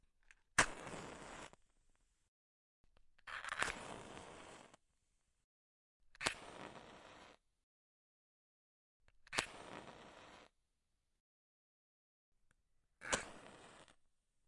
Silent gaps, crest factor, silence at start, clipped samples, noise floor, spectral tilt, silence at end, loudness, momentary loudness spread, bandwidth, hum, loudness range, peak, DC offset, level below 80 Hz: 2.28-2.84 s, 5.44-6.00 s, 7.63-9.00 s, 11.20-12.32 s; 38 dB; 0.3 s; under 0.1%; -85 dBFS; -1.5 dB/octave; 0.55 s; -43 LUFS; 22 LU; 11.5 kHz; none; 4 LU; -12 dBFS; under 0.1%; -68 dBFS